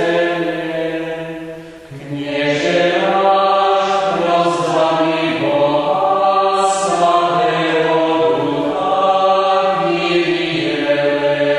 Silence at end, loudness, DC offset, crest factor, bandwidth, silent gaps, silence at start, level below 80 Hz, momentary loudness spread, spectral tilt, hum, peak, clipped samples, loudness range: 0 s; -15 LUFS; under 0.1%; 14 dB; 11.5 kHz; none; 0 s; -54 dBFS; 9 LU; -4.5 dB/octave; none; -2 dBFS; under 0.1%; 2 LU